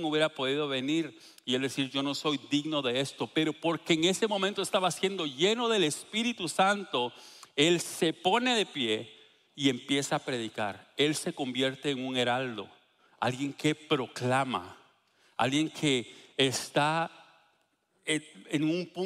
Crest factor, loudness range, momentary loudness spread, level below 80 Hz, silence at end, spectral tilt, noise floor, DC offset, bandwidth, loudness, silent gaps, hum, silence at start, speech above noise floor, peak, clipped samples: 22 dB; 3 LU; 8 LU; -76 dBFS; 0 s; -4 dB/octave; -73 dBFS; under 0.1%; 15 kHz; -30 LUFS; none; none; 0 s; 43 dB; -10 dBFS; under 0.1%